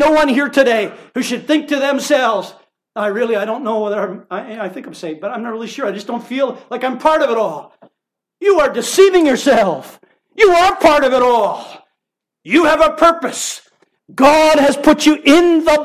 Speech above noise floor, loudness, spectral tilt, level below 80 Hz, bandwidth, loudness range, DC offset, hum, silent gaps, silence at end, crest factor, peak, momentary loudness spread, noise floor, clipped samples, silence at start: 66 dB; -14 LUFS; -3.5 dB/octave; -48 dBFS; 15.5 kHz; 9 LU; under 0.1%; none; none; 0 s; 14 dB; 0 dBFS; 16 LU; -80 dBFS; under 0.1%; 0 s